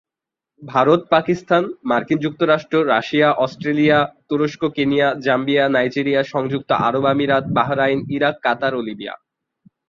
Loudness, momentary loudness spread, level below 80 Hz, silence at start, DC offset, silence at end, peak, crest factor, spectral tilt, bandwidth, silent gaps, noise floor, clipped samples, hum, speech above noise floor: -18 LUFS; 6 LU; -58 dBFS; 0.6 s; under 0.1%; 0.75 s; -2 dBFS; 16 dB; -7 dB/octave; 7.4 kHz; none; -86 dBFS; under 0.1%; none; 69 dB